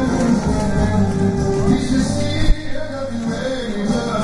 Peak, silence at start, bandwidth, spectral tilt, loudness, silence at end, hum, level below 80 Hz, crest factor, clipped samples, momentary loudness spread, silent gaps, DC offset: -2 dBFS; 0 s; 11.5 kHz; -6.5 dB/octave; -19 LUFS; 0 s; none; -26 dBFS; 16 dB; under 0.1%; 7 LU; none; under 0.1%